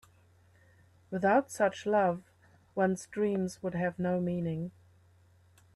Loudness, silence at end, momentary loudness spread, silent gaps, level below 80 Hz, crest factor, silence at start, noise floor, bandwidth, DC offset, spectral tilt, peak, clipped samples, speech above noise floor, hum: -31 LUFS; 1.05 s; 12 LU; none; -70 dBFS; 18 dB; 1.1 s; -63 dBFS; 12.5 kHz; under 0.1%; -6.5 dB/octave; -14 dBFS; under 0.1%; 33 dB; none